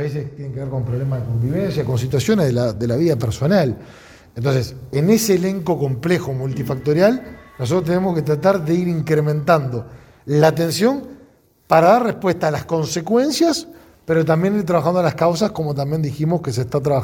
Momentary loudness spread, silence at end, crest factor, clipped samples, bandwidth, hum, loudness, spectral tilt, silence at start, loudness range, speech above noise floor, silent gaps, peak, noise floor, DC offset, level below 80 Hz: 9 LU; 0 s; 18 dB; under 0.1%; 18.5 kHz; none; -18 LUFS; -6.5 dB/octave; 0 s; 2 LU; 33 dB; none; 0 dBFS; -51 dBFS; under 0.1%; -48 dBFS